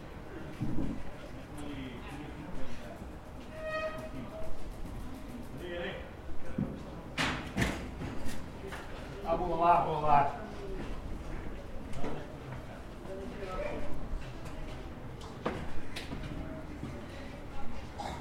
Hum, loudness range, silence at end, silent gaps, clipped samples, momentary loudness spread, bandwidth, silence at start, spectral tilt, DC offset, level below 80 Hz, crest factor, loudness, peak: none; 10 LU; 0 s; none; under 0.1%; 13 LU; 15 kHz; 0 s; -6 dB/octave; under 0.1%; -46 dBFS; 22 dB; -38 LUFS; -12 dBFS